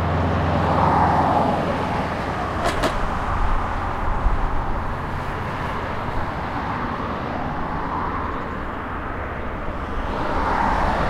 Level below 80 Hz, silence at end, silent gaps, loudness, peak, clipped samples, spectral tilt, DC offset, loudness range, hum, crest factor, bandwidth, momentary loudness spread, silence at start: -28 dBFS; 0 s; none; -23 LUFS; -6 dBFS; under 0.1%; -6.5 dB/octave; under 0.1%; 6 LU; none; 16 dB; 13 kHz; 10 LU; 0 s